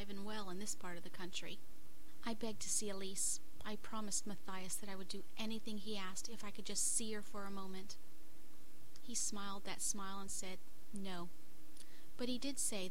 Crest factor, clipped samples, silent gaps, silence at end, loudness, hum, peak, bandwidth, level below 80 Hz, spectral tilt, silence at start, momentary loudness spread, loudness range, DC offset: 20 dB; under 0.1%; none; 0 s; -44 LUFS; none; -24 dBFS; 16.5 kHz; -66 dBFS; -2.5 dB/octave; 0 s; 21 LU; 3 LU; 2%